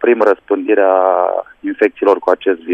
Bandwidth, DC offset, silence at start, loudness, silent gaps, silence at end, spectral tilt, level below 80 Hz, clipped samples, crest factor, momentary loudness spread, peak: 6.6 kHz; under 0.1%; 0 s; -14 LUFS; none; 0 s; -6 dB/octave; -60 dBFS; under 0.1%; 14 dB; 6 LU; 0 dBFS